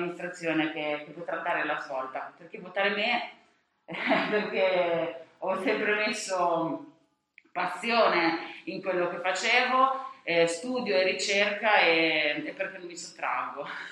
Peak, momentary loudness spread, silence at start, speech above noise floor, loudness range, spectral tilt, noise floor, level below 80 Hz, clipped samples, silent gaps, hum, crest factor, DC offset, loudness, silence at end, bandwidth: -8 dBFS; 13 LU; 0 s; 34 dB; 5 LU; -3 dB/octave; -62 dBFS; -82 dBFS; under 0.1%; none; none; 22 dB; under 0.1%; -27 LUFS; 0 s; 12 kHz